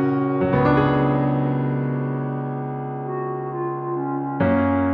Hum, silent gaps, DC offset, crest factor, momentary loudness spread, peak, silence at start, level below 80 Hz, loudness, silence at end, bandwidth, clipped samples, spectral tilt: none; none; under 0.1%; 14 dB; 9 LU; -6 dBFS; 0 s; -46 dBFS; -22 LUFS; 0 s; 4.9 kHz; under 0.1%; -11 dB/octave